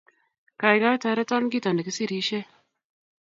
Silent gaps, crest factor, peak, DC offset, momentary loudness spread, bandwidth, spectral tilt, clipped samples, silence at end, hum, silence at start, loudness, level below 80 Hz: none; 22 dB; -4 dBFS; under 0.1%; 8 LU; 8 kHz; -4.5 dB/octave; under 0.1%; 0.9 s; none; 0.6 s; -24 LUFS; -76 dBFS